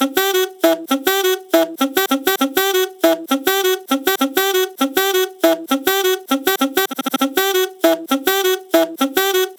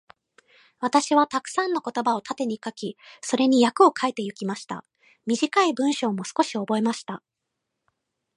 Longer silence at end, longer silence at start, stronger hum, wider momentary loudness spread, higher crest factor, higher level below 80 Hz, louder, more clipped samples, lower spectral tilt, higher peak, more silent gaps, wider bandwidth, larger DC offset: second, 0.05 s vs 1.2 s; second, 0 s vs 0.8 s; neither; second, 2 LU vs 16 LU; about the same, 18 dB vs 20 dB; first, -64 dBFS vs -76 dBFS; first, -17 LUFS vs -24 LUFS; neither; second, -1 dB/octave vs -4 dB/octave; first, 0 dBFS vs -4 dBFS; neither; first, over 20 kHz vs 11.5 kHz; neither